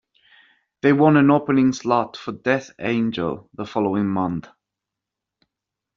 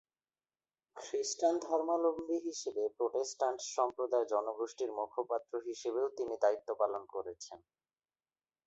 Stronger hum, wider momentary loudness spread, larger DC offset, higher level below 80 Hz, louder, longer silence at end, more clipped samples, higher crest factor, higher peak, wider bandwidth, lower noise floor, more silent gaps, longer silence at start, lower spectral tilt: neither; first, 13 LU vs 9 LU; neither; first, -60 dBFS vs -82 dBFS; first, -20 LUFS vs -36 LUFS; first, 1.55 s vs 1.1 s; neither; about the same, 18 dB vs 18 dB; first, -2 dBFS vs -18 dBFS; second, 7.4 kHz vs 8.2 kHz; second, -85 dBFS vs under -90 dBFS; neither; about the same, 0.85 s vs 0.95 s; first, -6 dB/octave vs -2.5 dB/octave